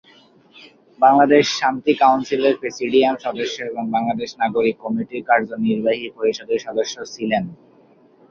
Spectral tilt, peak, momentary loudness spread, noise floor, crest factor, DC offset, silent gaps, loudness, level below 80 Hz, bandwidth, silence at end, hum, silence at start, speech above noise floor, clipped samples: -4.5 dB/octave; -2 dBFS; 10 LU; -52 dBFS; 18 dB; under 0.1%; none; -19 LUFS; -62 dBFS; 7.2 kHz; 0.75 s; none; 1 s; 33 dB; under 0.1%